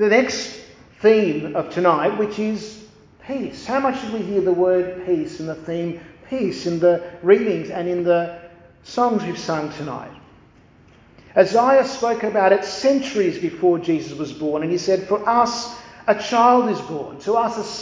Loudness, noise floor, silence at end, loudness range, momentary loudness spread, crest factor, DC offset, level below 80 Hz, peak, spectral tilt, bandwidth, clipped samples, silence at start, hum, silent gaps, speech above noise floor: -20 LUFS; -50 dBFS; 0 s; 4 LU; 14 LU; 20 dB; under 0.1%; -56 dBFS; 0 dBFS; -5.5 dB/octave; 7.6 kHz; under 0.1%; 0 s; none; none; 31 dB